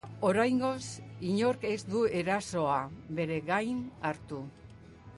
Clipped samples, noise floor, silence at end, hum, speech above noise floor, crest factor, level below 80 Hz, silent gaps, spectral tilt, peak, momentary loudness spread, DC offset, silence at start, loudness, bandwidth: under 0.1%; -51 dBFS; 0 s; none; 20 dB; 16 dB; -62 dBFS; none; -5.5 dB/octave; -16 dBFS; 12 LU; under 0.1%; 0.05 s; -32 LUFS; 11.5 kHz